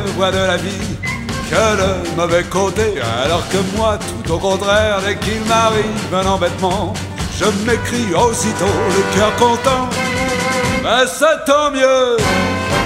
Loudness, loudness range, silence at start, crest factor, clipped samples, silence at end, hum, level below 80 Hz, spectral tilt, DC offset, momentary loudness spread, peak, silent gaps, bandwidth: -15 LUFS; 2 LU; 0 s; 16 dB; under 0.1%; 0 s; none; -34 dBFS; -4 dB/octave; under 0.1%; 6 LU; 0 dBFS; none; 16 kHz